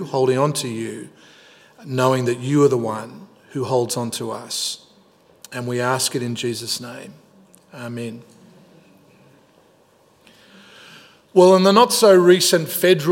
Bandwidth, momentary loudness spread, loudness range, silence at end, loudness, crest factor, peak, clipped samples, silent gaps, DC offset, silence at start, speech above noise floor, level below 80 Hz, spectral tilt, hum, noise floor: 16.5 kHz; 20 LU; 22 LU; 0 s; -18 LUFS; 20 dB; 0 dBFS; under 0.1%; none; under 0.1%; 0 s; 38 dB; -72 dBFS; -4.5 dB/octave; none; -56 dBFS